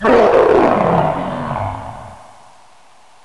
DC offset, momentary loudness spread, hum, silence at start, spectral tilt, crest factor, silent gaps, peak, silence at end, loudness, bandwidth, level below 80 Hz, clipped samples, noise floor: 0.5%; 19 LU; none; 0 s; -7.5 dB/octave; 12 dB; none; -4 dBFS; 1.1 s; -14 LUFS; 11 kHz; -40 dBFS; under 0.1%; -48 dBFS